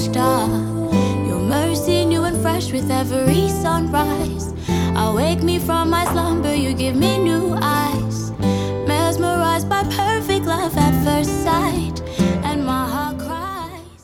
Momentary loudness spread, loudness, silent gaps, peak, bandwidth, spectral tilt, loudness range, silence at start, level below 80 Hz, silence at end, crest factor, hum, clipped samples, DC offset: 6 LU; -19 LUFS; none; -2 dBFS; 18 kHz; -5.5 dB/octave; 1 LU; 0 s; -36 dBFS; 0.15 s; 16 dB; none; under 0.1%; under 0.1%